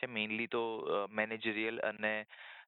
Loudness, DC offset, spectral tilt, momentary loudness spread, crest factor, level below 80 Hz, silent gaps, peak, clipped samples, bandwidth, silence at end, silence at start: -36 LUFS; under 0.1%; -7.5 dB/octave; 2 LU; 20 dB; -78 dBFS; none; -18 dBFS; under 0.1%; 4.4 kHz; 0.05 s; 0 s